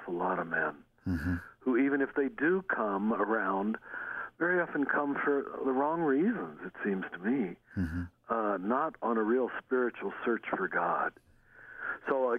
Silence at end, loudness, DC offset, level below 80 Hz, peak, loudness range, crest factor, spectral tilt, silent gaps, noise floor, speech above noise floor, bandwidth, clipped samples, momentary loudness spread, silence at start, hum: 0 s; -32 LUFS; under 0.1%; -58 dBFS; -18 dBFS; 2 LU; 14 dB; -9 dB/octave; none; -54 dBFS; 23 dB; 5.6 kHz; under 0.1%; 8 LU; 0 s; none